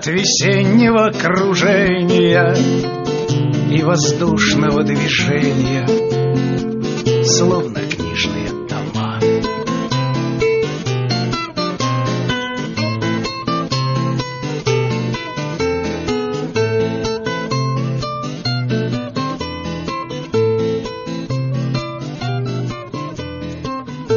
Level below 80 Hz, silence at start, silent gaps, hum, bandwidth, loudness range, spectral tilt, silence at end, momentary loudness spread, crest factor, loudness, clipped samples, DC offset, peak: -42 dBFS; 0 s; none; none; 7.2 kHz; 6 LU; -5 dB/octave; 0 s; 11 LU; 16 dB; -17 LUFS; under 0.1%; under 0.1%; -2 dBFS